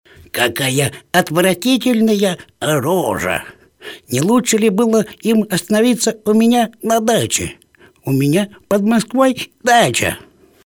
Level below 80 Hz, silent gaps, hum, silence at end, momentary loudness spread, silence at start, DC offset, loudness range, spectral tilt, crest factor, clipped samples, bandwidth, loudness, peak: -50 dBFS; none; none; 0.5 s; 8 LU; 0.35 s; under 0.1%; 2 LU; -4.5 dB/octave; 16 dB; under 0.1%; 19 kHz; -15 LUFS; 0 dBFS